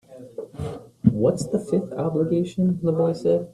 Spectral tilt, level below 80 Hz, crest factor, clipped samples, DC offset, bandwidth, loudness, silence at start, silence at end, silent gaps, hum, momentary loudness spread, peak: -8.5 dB/octave; -54 dBFS; 20 dB; under 0.1%; under 0.1%; 12 kHz; -23 LUFS; 0.1 s; 0.05 s; none; none; 14 LU; -4 dBFS